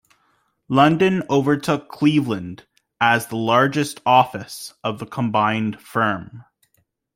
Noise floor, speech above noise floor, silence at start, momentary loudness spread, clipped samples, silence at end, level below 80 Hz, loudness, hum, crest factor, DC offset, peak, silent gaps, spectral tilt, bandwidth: -67 dBFS; 48 dB; 0.7 s; 12 LU; under 0.1%; 0.75 s; -60 dBFS; -19 LUFS; none; 18 dB; under 0.1%; -2 dBFS; none; -5.5 dB/octave; 16 kHz